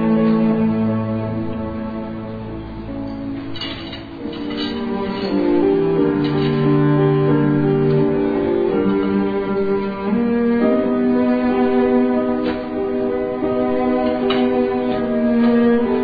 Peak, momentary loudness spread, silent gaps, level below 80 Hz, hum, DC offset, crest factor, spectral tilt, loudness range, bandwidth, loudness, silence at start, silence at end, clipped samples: -4 dBFS; 12 LU; none; -42 dBFS; none; 0.4%; 14 dB; -10 dB/octave; 9 LU; 5 kHz; -18 LUFS; 0 s; 0 s; under 0.1%